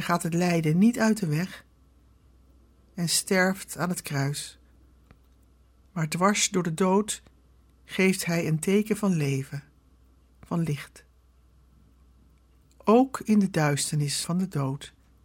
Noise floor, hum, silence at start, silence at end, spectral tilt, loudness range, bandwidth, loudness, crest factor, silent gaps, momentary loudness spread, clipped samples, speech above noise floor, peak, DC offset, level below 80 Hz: -59 dBFS; none; 0 s; 0.35 s; -5 dB/octave; 4 LU; 17 kHz; -26 LUFS; 20 dB; none; 13 LU; under 0.1%; 34 dB; -8 dBFS; under 0.1%; -58 dBFS